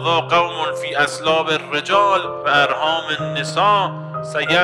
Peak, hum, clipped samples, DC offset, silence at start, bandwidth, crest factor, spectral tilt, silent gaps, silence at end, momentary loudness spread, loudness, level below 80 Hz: -2 dBFS; none; under 0.1%; under 0.1%; 0 s; 13 kHz; 16 dB; -3.5 dB/octave; none; 0 s; 7 LU; -18 LUFS; -60 dBFS